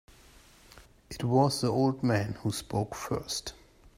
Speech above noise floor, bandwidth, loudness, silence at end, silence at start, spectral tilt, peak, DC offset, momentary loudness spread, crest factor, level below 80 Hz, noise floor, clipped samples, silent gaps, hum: 28 dB; 16 kHz; -30 LUFS; 0.45 s; 0.75 s; -5.5 dB/octave; -10 dBFS; under 0.1%; 10 LU; 20 dB; -56 dBFS; -56 dBFS; under 0.1%; none; none